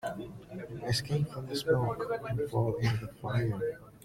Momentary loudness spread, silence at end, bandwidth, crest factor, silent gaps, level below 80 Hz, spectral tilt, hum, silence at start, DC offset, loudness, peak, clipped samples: 11 LU; 0.05 s; 16 kHz; 18 dB; none; -56 dBFS; -6 dB/octave; none; 0 s; under 0.1%; -33 LUFS; -16 dBFS; under 0.1%